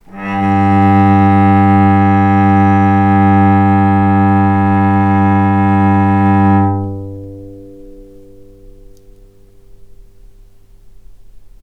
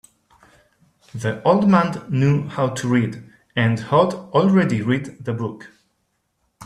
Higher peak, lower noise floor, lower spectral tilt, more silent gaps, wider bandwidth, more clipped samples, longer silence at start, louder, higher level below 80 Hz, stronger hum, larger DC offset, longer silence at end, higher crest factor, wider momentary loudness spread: about the same, 0 dBFS vs -2 dBFS; second, -41 dBFS vs -70 dBFS; first, -10 dB/octave vs -7 dB/octave; neither; second, 4.3 kHz vs 11.5 kHz; neither; second, 0.15 s vs 1.15 s; first, -10 LUFS vs -20 LUFS; first, -42 dBFS vs -56 dBFS; neither; neither; first, 0.15 s vs 0 s; second, 12 dB vs 18 dB; about the same, 10 LU vs 12 LU